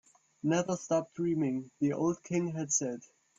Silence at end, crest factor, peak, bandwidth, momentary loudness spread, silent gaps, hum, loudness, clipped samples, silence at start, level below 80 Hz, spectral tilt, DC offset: 0.35 s; 16 dB; -16 dBFS; 7.8 kHz; 4 LU; none; none; -32 LUFS; under 0.1%; 0.45 s; -74 dBFS; -5 dB/octave; under 0.1%